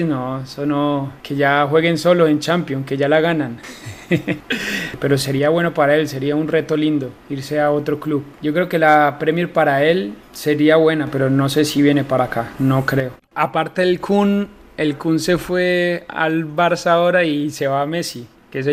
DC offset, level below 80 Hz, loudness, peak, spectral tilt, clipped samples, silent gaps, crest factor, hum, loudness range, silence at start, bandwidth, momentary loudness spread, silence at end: under 0.1%; -50 dBFS; -17 LUFS; 0 dBFS; -6 dB/octave; under 0.1%; none; 16 dB; none; 3 LU; 0 s; 15.5 kHz; 9 LU; 0 s